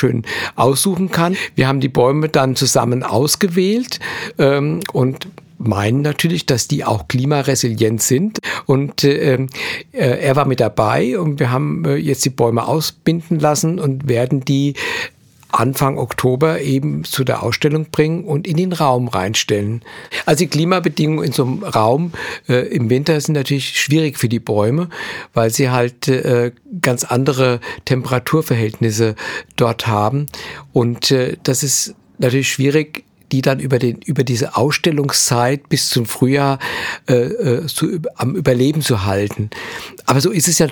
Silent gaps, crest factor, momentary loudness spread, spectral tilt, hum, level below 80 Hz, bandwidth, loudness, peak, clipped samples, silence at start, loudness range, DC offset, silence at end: none; 16 dB; 7 LU; -5 dB/octave; none; -50 dBFS; over 20 kHz; -16 LUFS; 0 dBFS; under 0.1%; 0 s; 2 LU; under 0.1%; 0 s